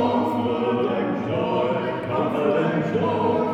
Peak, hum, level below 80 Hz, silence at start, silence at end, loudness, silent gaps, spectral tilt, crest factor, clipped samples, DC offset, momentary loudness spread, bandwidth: -8 dBFS; none; -60 dBFS; 0 s; 0 s; -23 LUFS; none; -8 dB/octave; 14 dB; under 0.1%; under 0.1%; 3 LU; 9.2 kHz